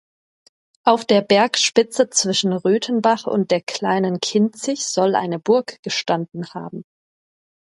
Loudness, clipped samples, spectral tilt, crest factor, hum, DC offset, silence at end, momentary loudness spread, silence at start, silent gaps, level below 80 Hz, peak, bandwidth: -19 LUFS; under 0.1%; -3.5 dB/octave; 20 dB; none; under 0.1%; 0.9 s; 9 LU; 0.85 s; 5.79-5.83 s; -68 dBFS; 0 dBFS; 11.5 kHz